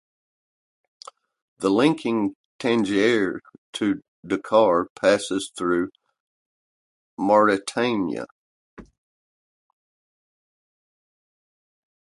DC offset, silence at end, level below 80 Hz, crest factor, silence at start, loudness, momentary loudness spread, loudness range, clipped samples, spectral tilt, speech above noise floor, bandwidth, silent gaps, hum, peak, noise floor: under 0.1%; 3.25 s; -64 dBFS; 22 dB; 1.6 s; -22 LUFS; 11 LU; 3 LU; under 0.1%; -5 dB/octave; over 69 dB; 11.5 kHz; 2.35-2.59 s, 3.58-3.73 s, 4.08-4.23 s, 4.90-4.96 s, 6.20-7.17 s, 8.32-8.77 s; none; -4 dBFS; under -90 dBFS